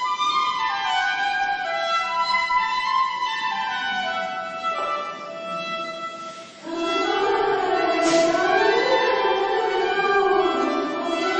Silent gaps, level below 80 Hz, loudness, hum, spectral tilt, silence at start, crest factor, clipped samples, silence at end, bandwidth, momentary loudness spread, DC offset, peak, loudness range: none; -58 dBFS; -22 LUFS; none; -2.5 dB/octave; 0 s; 16 dB; under 0.1%; 0 s; 8.8 kHz; 10 LU; under 0.1%; -8 dBFS; 7 LU